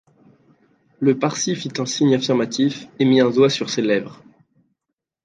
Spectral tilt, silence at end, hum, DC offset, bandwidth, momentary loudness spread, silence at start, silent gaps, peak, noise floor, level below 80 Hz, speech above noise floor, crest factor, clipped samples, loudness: -5 dB/octave; 1.1 s; none; under 0.1%; 9.4 kHz; 7 LU; 1 s; none; -4 dBFS; -82 dBFS; -68 dBFS; 63 dB; 18 dB; under 0.1%; -19 LUFS